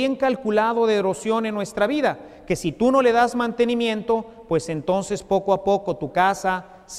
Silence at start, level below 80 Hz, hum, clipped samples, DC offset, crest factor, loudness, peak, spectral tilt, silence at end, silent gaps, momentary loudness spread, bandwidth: 0 s; -52 dBFS; none; under 0.1%; under 0.1%; 16 dB; -22 LUFS; -6 dBFS; -5 dB/octave; 0 s; none; 7 LU; 14 kHz